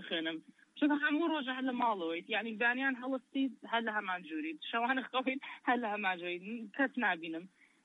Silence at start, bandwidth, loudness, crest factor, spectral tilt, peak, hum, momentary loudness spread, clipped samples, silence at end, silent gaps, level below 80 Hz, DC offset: 0 s; 4.2 kHz; -35 LUFS; 16 dB; -5.5 dB/octave; -20 dBFS; none; 9 LU; under 0.1%; 0.4 s; none; under -90 dBFS; under 0.1%